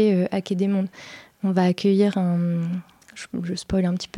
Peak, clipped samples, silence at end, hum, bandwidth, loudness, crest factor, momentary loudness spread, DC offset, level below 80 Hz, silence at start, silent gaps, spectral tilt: -8 dBFS; under 0.1%; 0 s; none; 11 kHz; -23 LUFS; 14 dB; 16 LU; under 0.1%; -50 dBFS; 0 s; none; -7.5 dB/octave